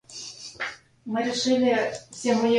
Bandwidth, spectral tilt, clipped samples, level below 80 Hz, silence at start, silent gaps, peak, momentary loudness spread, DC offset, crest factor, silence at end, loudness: 11 kHz; -3.5 dB/octave; under 0.1%; -68 dBFS; 0.1 s; none; -10 dBFS; 16 LU; under 0.1%; 14 dB; 0 s; -26 LUFS